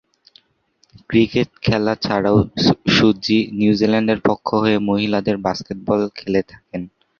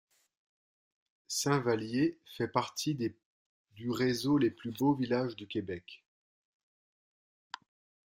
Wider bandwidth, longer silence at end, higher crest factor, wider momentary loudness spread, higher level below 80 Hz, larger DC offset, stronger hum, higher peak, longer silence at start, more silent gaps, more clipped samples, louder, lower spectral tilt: second, 7 kHz vs 16 kHz; second, 0.3 s vs 2.15 s; second, 16 dB vs 22 dB; second, 8 LU vs 16 LU; first, -46 dBFS vs -72 dBFS; neither; neither; first, -2 dBFS vs -12 dBFS; second, 1.1 s vs 1.3 s; second, none vs 3.25-3.65 s; neither; first, -18 LUFS vs -33 LUFS; first, -6.5 dB/octave vs -5 dB/octave